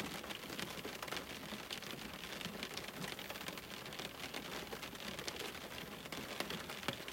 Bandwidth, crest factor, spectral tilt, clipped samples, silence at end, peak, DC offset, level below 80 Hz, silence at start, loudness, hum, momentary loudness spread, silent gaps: 16 kHz; 26 dB; -3 dB/octave; under 0.1%; 0 s; -20 dBFS; under 0.1%; -68 dBFS; 0 s; -45 LUFS; none; 4 LU; none